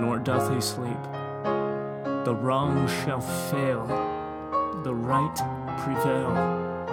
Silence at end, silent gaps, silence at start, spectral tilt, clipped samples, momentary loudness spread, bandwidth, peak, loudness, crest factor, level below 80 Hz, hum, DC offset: 0 s; none; 0 s; -6 dB/octave; under 0.1%; 6 LU; 19.5 kHz; -8 dBFS; -27 LUFS; 18 dB; -58 dBFS; none; under 0.1%